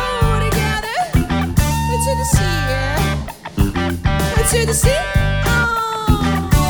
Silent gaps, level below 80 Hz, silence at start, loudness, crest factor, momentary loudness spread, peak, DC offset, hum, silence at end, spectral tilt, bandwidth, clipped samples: none; -22 dBFS; 0 s; -17 LUFS; 14 dB; 4 LU; -2 dBFS; under 0.1%; none; 0 s; -4.5 dB/octave; over 20 kHz; under 0.1%